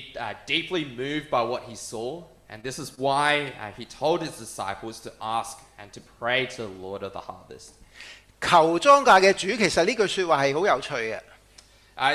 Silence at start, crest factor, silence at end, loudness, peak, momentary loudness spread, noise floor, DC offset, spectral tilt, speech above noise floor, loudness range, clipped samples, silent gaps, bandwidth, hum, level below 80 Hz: 0 s; 20 dB; 0 s; -23 LUFS; -6 dBFS; 21 LU; -54 dBFS; under 0.1%; -3.5 dB/octave; 29 dB; 11 LU; under 0.1%; none; 14.5 kHz; none; -58 dBFS